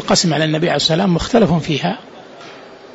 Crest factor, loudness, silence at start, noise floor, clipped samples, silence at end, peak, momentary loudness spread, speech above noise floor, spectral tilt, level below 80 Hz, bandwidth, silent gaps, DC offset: 14 dB; -15 LUFS; 0 s; -37 dBFS; under 0.1%; 0.05 s; -2 dBFS; 22 LU; 22 dB; -4.5 dB/octave; -40 dBFS; 8 kHz; none; under 0.1%